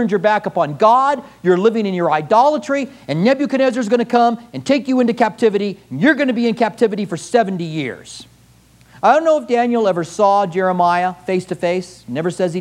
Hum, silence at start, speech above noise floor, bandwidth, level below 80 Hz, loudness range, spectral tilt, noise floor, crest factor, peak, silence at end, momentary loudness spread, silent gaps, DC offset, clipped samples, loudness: none; 0 s; 33 dB; 12 kHz; -60 dBFS; 3 LU; -6 dB/octave; -49 dBFS; 16 dB; 0 dBFS; 0 s; 10 LU; none; under 0.1%; under 0.1%; -16 LUFS